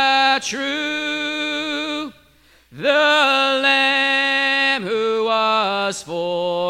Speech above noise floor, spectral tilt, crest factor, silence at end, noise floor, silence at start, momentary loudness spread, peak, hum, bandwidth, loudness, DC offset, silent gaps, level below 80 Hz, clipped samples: 34 dB; -2.5 dB/octave; 16 dB; 0 s; -53 dBFS; 0 s; 9 LU; -4 dBFS; none; 16 kHz; -18 LUFS; under 0.1%; none; -62 dBFS; under 0.1%